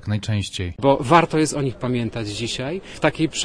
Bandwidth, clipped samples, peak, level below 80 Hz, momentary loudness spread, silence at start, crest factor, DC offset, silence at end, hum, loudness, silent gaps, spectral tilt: 10.5 kHz; under 0.1%; 0 dBFS; -46 dBFS; 11 LU; 0 s; 20 dB; under 0.1%; 0 s; none; -21 LUFS; none; -5 dB/octave